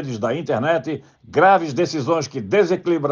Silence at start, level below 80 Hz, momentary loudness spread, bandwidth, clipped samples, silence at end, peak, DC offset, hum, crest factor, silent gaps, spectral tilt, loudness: 0 s; -64 dBFS; 9 LU; 7.4 kHz; under 0.1%; 0 s; -4 dBFS; under 0.1%; none; 16 dB; none; -6 dB/octave; -19 LUFS